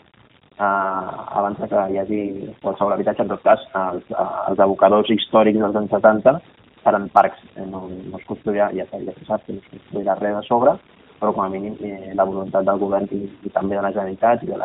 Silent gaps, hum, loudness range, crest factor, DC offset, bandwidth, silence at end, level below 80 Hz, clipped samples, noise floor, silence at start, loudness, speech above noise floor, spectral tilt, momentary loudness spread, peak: none; none; 6 LU; 20 dB; under 0.1%; 4 kHz; 0 s; -56 dBFS; under 0.1%; -53 dBFS; 0.6 s; -20 LUFS; 34 dB; -4.5 dB/octave; 14 LU; 0 dBFS